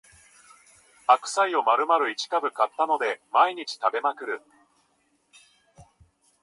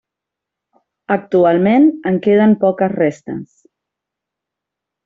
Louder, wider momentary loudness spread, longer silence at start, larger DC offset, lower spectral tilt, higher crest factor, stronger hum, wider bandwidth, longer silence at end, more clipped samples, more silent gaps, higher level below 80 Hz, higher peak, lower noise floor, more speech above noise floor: second, -24 LUFS vs -14 LUFS; second, 8 LU vs 13 LU; about the same, 1.1 s vs 1.1 s; neither; second, -1.5 dB/octave vs -8.5 dB/octave; first, 22 dB vs 14 dB; neither; first, 11.5 kHz vs 7.4 kHz; second, 0.6 s vs 1.6 s; neither; neither; second, -72 dBFS vs -60 dBFS; about the same, -4 dBFS vs -2 dBFS; second, -69 dBFS vs -83 dBFS; second, 45 dB vs 69 dB